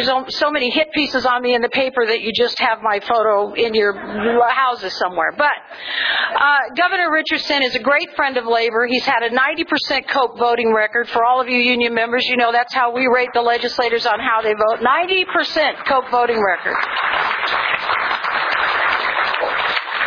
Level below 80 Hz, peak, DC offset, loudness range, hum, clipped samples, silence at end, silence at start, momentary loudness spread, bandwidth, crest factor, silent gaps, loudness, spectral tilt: -56 dBFS; -2 dBFS; under 0.1%; 1 LU; none; under 0.1%; 0 s; 0 s; 3 LU; 5.4 kHz; 16 dB; none; -17 LUFS; -3.5 dB/octave